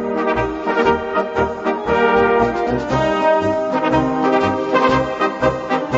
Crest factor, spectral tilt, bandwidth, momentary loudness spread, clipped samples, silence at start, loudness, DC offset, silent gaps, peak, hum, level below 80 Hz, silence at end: 16 dB; -6.5 dB/octave; 8 kHz; 5 LU; under 0.1%; 0 s; -17 LUFS; under 0.1%; none; -2 dBFS; none; -40 dBFS; 0 s